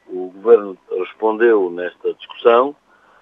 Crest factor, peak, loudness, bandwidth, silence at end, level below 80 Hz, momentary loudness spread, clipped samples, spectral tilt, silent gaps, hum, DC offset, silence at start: 18 dB; 0 dBFS; -17 LUFS; 3.9 kHz; 0.5 s; -76 dBFS; 12 LU; under 0.1%; -7 dB/octave; none; none; under 0.1%; 0.1 s